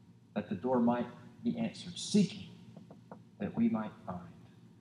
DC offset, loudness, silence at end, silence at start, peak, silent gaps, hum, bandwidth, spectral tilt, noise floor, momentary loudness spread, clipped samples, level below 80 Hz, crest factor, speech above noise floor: under 0.1%; -35 LUFS; 0.35 s; 0.1 s; -18 dBFS; none; none; 11 kHz; -6 dB/octave; -54 dBFS; 23 LU; under 0.1%; -74 dBFS; 18 dB; 21 dB